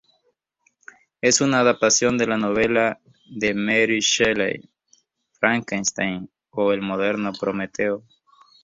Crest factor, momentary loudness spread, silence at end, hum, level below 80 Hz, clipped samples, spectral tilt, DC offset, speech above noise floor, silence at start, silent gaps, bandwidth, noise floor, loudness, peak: 20 dB; 9 LU; 0.65 s; none; -58 dBFS; under 0.1%; -3 dB/octave; under 0.1%; 49 dB; 1.25 s; none; 8 kHz; -70 dBFS; -21 LUFS; -2 dBFS